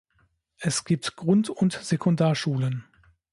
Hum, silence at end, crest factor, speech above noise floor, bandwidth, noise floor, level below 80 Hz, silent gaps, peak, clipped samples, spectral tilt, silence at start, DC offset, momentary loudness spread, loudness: none; 0.5 s; 16 dB; 44 dB; 11.5 kHz; -68 dBFS; -62 dBFS; none; -10 dBFS; under 0.1%; -5.5 dB/octave; 0.6 s; under 0.1%; 7 LU; -25 LUFS